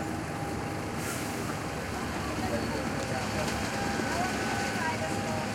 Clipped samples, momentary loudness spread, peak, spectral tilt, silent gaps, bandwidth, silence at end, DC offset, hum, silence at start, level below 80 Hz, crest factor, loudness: under 0.1%; 4 LU; -16 dBFS; -4.5 dB/octave; none; 16.5 kHz; 0 s; under 0.1%; none; 0 s; -48 dBFS; 16 dB; -32 LUFS